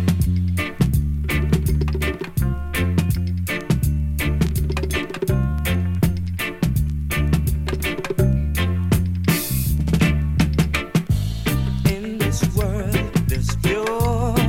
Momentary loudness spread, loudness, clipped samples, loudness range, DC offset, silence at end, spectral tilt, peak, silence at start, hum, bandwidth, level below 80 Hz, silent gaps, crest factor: 4 LU; -21 LUFS; under 0.1%; 2 LU; under 0.1%; 0 s; -6 dB/octave; -4 dBFS; 0 s; none; 17 kHz; -26 dBFS; none; 16 dB